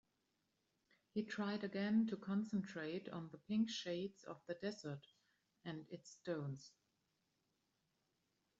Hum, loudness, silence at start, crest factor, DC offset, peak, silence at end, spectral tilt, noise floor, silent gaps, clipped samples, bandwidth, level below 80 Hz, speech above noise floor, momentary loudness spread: none; -44 LUFS; 1.15 s; 18 dB; under 0.1%; -28 dBFS; 1.9 s; -5.5 dB/octave; -85 dBFS; none; under 0.1%; 7.8 kHz; -86 dBFS; 42 dB; 15 LU